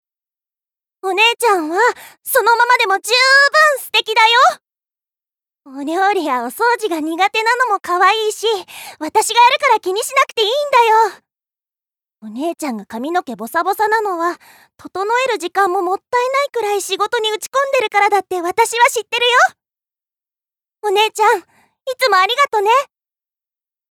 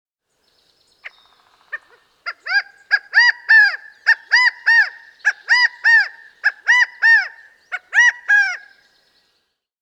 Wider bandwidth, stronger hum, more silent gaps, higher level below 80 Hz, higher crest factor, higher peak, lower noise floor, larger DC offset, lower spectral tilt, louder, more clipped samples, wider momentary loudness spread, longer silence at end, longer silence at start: first, 20 kHz vs 11 kHz; neither; neither; first, -70 dBFS vs -82 dBFS; about the same, 14 dB vs 16 dB; about the same, -2 dBFS vs -4 dBFS; first, under -90 dBFS vs -69 dBFS; neither; first, -0.5 dB/octave vs 5 dB/octave; about the same, -14 LUFS vs -14 LUFS; neither; second, 12 LU vs 19 LU; second, 1.1 s vs 1.25 s; about the same, 1.05 s vs 1.05 s